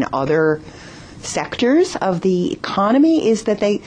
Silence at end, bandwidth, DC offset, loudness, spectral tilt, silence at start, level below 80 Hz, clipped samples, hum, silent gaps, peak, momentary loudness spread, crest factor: 0 s; 10 kHz; under 0.1%; -17 LUFS; -5.5 dB/octave; 0 s; -50 dBFS; under 0.1%; none; none; -6 dBFS; 15 LU; 12 dB